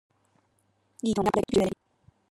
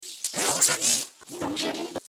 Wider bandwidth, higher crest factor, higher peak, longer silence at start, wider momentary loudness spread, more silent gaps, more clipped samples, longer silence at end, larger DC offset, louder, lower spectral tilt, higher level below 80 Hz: second, 15.5 kHz vs 18 kHz; about the same, 22 dB vs 22 dB; about the same, -8 dBFS vs -6 dBFS; first, 1.05 s vs 0 s; second, 9 LU vs 14 LU; neither; neither; first, 0.55 s vs 0.1 s; neither; second, -27 LUFS vs -24 LUFS; first, -6 dB/octave vs -0.5 dB/octave; first, -54 dBFS vs -66 dBFS